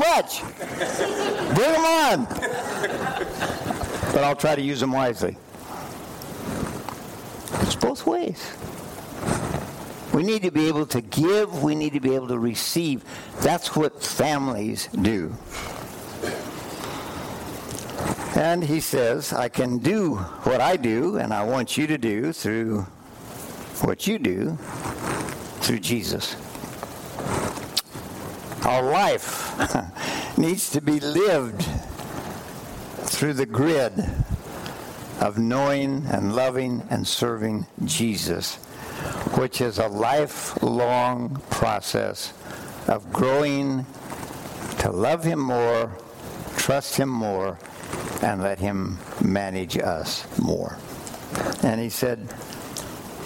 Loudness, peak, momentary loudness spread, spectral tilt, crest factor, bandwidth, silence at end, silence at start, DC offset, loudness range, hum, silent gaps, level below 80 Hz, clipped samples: -25 LUFS; -8 dBFS; 14 LU; -4.5 dB/octave; 18 dB; 17 kHz; 0 s; 0 s; under 0.1%; 5 LU; none; none; -46 dBFS; under 0.1%